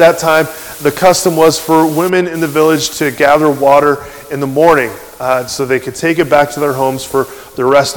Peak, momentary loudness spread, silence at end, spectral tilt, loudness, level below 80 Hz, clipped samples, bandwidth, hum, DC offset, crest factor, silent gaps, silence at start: 0 dBFS; 8 LU; 0 s; -4.5 dB/octave; -12 LUFS; -46 dBFS; 2%; 19.5 kHz; none; under 0.1%; 12 dB; none; 0 s